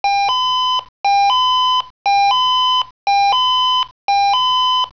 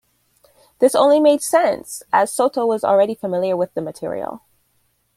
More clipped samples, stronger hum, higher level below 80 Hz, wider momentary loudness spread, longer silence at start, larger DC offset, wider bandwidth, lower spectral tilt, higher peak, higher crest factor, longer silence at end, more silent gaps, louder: neither; neither; first, -56 dBFS vs -64 dBFS; second, 5 LU vs 13 LU; second, 0.05 s vs 0.8 s; first, 0.4% vs under 0.1%; second, 5.4 kHz vs 15.5 kHz; second, 1.5 dB/octave vs -4 dB/octave; second, -6 dBFS vs -2 dBFS; second, 8 dB vs 16 dB; second, 0.05 s vs 0.8 s; first, 0.89-1.04 s, 1.90-2.05 s, 2.91-3.07 s, 3.91-4.08 s vs none; first, -14 LUFS vs -18 LUFS